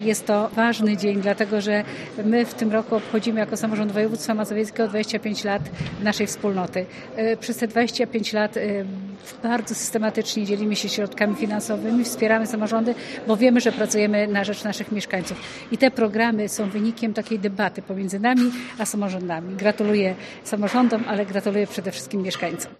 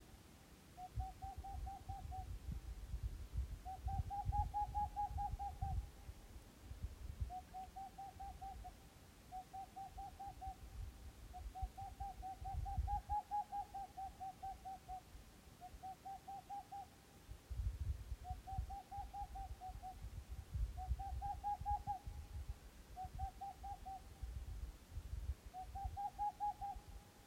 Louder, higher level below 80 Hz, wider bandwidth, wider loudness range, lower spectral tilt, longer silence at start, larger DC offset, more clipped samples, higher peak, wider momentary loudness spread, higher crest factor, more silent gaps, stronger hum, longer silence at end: first, -23 LUFS vs -49 LUFS; second, -60 dBFS vs -52 dBFS; second, 13.5 kHz vs 16 kHz; second, 3 LU vs 8 LU; second, -4.5 dB/octave vs -6 dB/octave; about the same, 0 s vs 0 s; neither; neither; first, -2 dBFS vs -28 dBFS; second, 8 LU vs 14 LU; about the same, 20 dB vs 20 dB; neither; neither; about the same, 0.05 s vs 0 s